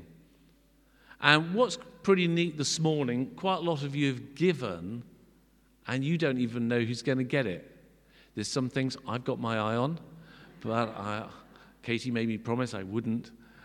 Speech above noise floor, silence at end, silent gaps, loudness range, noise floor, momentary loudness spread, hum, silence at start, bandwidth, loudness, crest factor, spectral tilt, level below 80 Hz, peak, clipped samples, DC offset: 34 dB; 0.3 s; none; 6 LU; -63 dBFS; 12 LU; none; 0 s; 12.5 kHz; -30 LUFS; 26 dB; -5 dB/octave; -66 dBFS; -4 dBFS; under 0.1%; under 0.1%